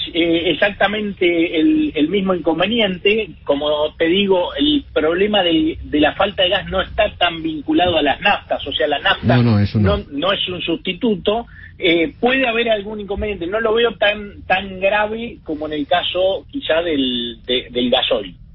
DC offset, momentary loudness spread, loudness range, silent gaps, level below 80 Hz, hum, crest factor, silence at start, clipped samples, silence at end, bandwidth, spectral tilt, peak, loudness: under 0.1%; 6 LU; 3 LU; none; -40 dBFS; none; 16 dB; 0 s; under 0.1%; 0.1 s; 5.8 kHz; -10.5 dB/octave; -2 dBFS; -17 LUFS